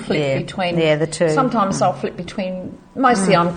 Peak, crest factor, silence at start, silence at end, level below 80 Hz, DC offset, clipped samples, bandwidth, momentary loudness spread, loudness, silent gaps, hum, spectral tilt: -2 dBFS; 18 dB; 0 s; 0 s; -50 dBFS; under 0.1%; under 0.1%; 9.8 kHz; 11 LU; -18 LUFS; none; none; -5.5 dB/octave